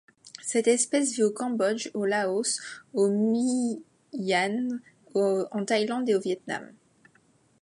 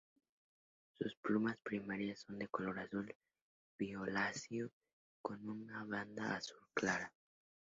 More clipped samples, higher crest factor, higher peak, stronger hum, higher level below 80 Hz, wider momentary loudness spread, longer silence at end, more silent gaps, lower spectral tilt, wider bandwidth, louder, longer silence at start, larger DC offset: neither; second, 16 dB vs 22 dB; first, -10 dBFS vs -24 dBFS; neither; about the same, -80 dBFS vs -78 dBFS; about the same, 11 LU vs 10 LU; first, 0.9 s vs 0.65 s; second, none vs 1.17-1.23 s, 3.15-3.21 s, 3.41-3.79 s, 4.73-4.81 s, 4.93-5.24 s; about the same, -3.5 dB/octave vs -4 dB/octave; first, 11.5 kHz vs 7.6 kHz; first, -27 LUFS vs -43 LUFS; second, 0.25 s vs 1 s; neither